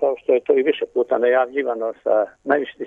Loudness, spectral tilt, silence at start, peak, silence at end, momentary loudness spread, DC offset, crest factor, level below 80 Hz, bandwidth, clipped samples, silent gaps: -20 LUFS; -6.5 dB/octave; 0 s; -4 dBFS; 0 s; 5 LU; under 0.1%; 16 dB; -68 dBFS; 3.8 kHz; under 0.1%; none